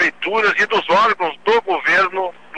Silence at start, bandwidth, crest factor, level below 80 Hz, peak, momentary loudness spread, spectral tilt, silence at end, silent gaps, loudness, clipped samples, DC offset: 0 s; 9.8 kHz; 12 dB; -64 dBFS; -4 dBFS; 5 LU; -3 dB/octave; 0 s; none; -16 LUFS; under 0.1%; 0.7%